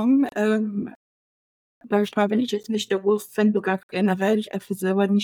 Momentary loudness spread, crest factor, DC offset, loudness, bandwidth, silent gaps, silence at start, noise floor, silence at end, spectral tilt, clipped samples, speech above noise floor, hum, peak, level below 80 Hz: 6 LU; 16 dB; under 0.1%; -23 LUFS; 17.5 kHz; 0.96-1.81 s, 3.83-3.89 s; 0 s; under -90 dBFS; 0 s; -6 dB/octave; under 0.1%; over 68 dB; none; -8 dBFS; -72 dBFS